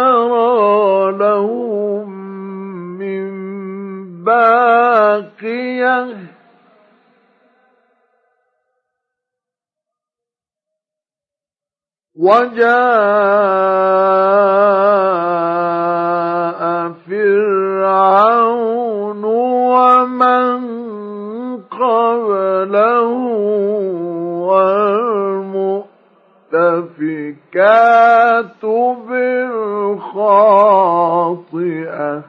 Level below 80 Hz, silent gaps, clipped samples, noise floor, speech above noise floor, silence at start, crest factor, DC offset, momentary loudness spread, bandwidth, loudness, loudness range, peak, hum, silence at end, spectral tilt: -78 dBFS; none; under 0.1%; under -90 dBFS; over 77 dB; 0 s; 14 dB; under 0.1%; 15 LU; 6.2 kHz; -13 LUFS; 6 LU; 0 dBFS; none; 0.05 s; -8 dB/octave